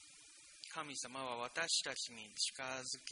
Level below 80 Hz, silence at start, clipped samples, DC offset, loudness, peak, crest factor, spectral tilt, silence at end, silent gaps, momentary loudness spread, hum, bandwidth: -84 dBFS; 0 s; under 0.1%; under 0.1%; -41 LUFS; -22 dBFS; 22 dB; 0 dB/octave; 0 s; none; 19 LU; none; 10.5 kHz